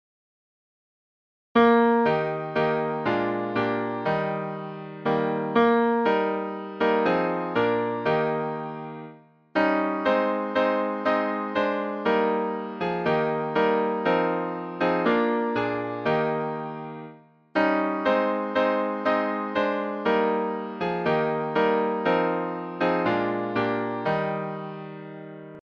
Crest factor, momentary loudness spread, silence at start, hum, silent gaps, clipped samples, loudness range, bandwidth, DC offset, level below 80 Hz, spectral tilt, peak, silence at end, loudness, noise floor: 18 dB; 11 LU; 1.55 s; none; none; under 0.1%; 2 LU; 6.6 kHz; under 0.1%; -64 dBFS; -8 dB/octave; -8 dBFS; 0.05 s; -25 LUFS; -48 dBFS